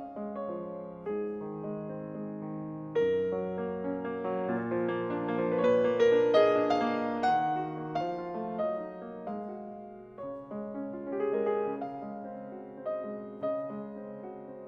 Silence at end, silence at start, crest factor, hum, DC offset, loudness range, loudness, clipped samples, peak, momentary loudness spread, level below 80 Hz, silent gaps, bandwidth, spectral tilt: 0 s; 0 s; 20 dB; none; under 0.1%; 9 LU; -32 LUFS; under 0.1%; -12 dBFS; 16 LU; -70 dBFS; none; 7.6 kHz; -7.5 dB/octave